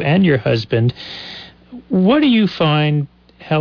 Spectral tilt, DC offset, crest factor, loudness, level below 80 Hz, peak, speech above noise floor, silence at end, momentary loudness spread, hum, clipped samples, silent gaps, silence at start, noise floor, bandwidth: -8.5 dB/octave; under 0.1%; 12 dB; -15 LUFS; -50 dBFS; -4 dBFS; 21 dB; 0 s; 17 LU; none; under 0.1%; none; 0 s; -36 dBFS; 5.4 kHz